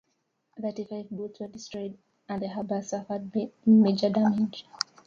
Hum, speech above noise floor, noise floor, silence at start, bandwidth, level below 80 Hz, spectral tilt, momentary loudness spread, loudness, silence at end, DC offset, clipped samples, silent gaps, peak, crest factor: none; 49 dB; -76 dBFS; 0.55 s; 7.4 kHz; -70 dBFS; -6.5 dB/octave; 18 LU; -28 LUFS; 0.25 s; under 0.1%; under 0.1%; none; -6 dBFS; 22 dB